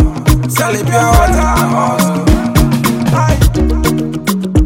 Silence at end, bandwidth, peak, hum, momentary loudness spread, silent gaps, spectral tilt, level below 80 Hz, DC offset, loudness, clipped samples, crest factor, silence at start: 0 s; 17.5 kHz; 0 dBFS; none; 4 LU; none; -6 dB/octave; -16 dBFS; under 0.1%; -12 LUFS; under 0.1%; 10 dB; 0 s